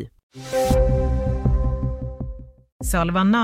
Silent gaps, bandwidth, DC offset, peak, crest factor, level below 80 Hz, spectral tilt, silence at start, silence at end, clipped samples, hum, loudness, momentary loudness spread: 0.23-0.30 s, 2.72-2.80 s; 16 kHz; under 0.1%; -6 dBFS; 14 dB; -26 dBFS; -6.5 dB/octave; 0 s; 0 s; under 0.1%; none; -22 LUFS; 16 LU